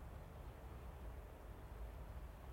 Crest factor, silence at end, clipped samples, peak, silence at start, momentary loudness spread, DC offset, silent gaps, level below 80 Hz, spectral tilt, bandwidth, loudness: 12 dB; 0 s; under 0.1%; -40 dBFS; 0 s; 2 LU; under 0.1%; none; -54 dBFS; -6.5 dB/octave; 16 kHz; -55 LUFS